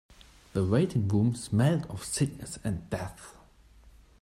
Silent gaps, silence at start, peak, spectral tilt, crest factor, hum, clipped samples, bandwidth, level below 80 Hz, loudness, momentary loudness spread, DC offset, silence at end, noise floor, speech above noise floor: none; 0.1 s; -12 dBFS; -6.5 dB/octave; 18 dB; none; under 0.1%; 14 kHz; -54 dBFS; -29 LUFS; 11 LU; under 0.1%; 0.3 s; -57 dBFS; 28 dB